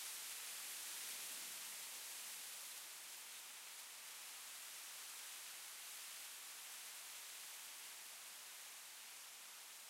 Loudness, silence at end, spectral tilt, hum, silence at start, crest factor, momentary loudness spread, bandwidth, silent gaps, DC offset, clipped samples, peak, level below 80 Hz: -50 LUFS; 0 s; 3 dB/octave; none; 0 s; 16 dB; 6 LU; 16 kHz; none; under 0.1%; under 0.1%; -36 dBFS; under -90 dBFS